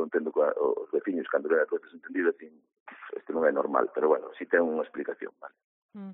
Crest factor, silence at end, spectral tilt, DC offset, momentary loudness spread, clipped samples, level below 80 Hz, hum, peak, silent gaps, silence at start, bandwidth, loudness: 20 dB; 0 s; 1 dB/octave; under 0.1%; 16 LU; under 0.1%; -80 dBFS; none; -10 dBFS; 2.80-2.86 s, 5.64-5.89 s; 0 s; 3.8 kHz; -28 LUFS